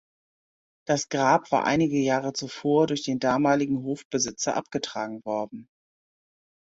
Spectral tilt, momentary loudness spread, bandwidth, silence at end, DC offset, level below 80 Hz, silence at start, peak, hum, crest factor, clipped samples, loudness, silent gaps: -4.5 dB/octave; 9 LU; 8 kHz; 1.05 s; under 0.1%; -64 dBFS; 0.85 s; -8 dBFS; none; 18 dB; under 0.1%; -25 LUFS; 4.05-4.11 s